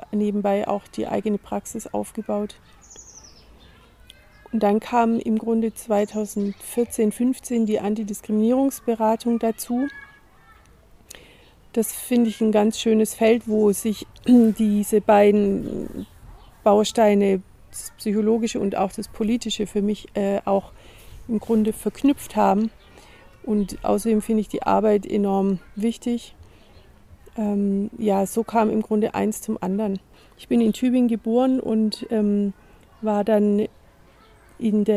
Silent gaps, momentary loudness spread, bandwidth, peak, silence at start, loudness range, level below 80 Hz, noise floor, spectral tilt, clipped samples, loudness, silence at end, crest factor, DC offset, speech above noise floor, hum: none; 10 LU; 16 kHz; -4 dBFS; 0.1 s; 7 LU; -50 dBFS; -52 dBFS; -6 dB/octave; under 0.1%; -22 LUFS; 0 s; 18 dB; under 0.1%; 31 dB; none